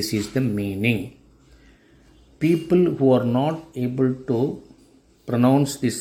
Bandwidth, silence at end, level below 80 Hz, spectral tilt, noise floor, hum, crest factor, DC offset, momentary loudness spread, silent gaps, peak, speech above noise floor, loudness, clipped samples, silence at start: 16.5 kHz; 0 s; -54 dBFS; -6.5 dB/octave; -55 dBFS; none; 18 dB; under 0.1%; 9 LU; none; -6 dBFS; 34 dB; -22 LUFS; under 0.1%; 0 s